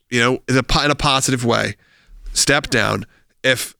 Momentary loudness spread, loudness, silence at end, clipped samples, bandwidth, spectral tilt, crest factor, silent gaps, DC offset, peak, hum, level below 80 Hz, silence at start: 6 LU; -17 LUFS; 0.1 s; under 0.1%; over 20 kHz; -3.5 dB/octave; 18 dB; none; under 0.1%; -2 dBFS; none; -34 dBFS; 0.1 s